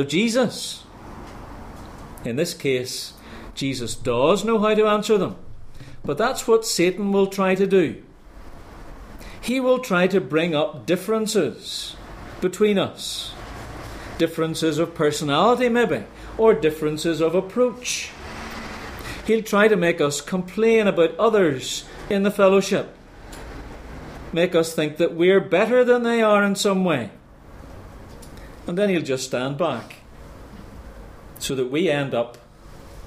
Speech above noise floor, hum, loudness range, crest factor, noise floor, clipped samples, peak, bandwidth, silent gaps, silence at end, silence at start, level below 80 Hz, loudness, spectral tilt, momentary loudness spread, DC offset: 23 dB; none; 7 LU; 18 dB; -43 dBFS; under 0.1%; -4 dBFS; 15.5 kHz; none; 0 s; 0 s; -46 dBFS; -21 LUFS; -5 dB/octave; 22 LU; under 0.1%